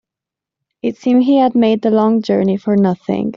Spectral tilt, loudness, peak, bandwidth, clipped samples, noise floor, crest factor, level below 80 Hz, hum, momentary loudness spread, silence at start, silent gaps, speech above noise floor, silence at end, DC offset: -7 dB/octave; -14 LUFS; -2 dBFS; 7 kHz; under 0.1%; -85 dBFS; 12 dB; -56 dBFS; none; 8 LU; 0.85 s; none; 72 dB; 0 s; under 0.1%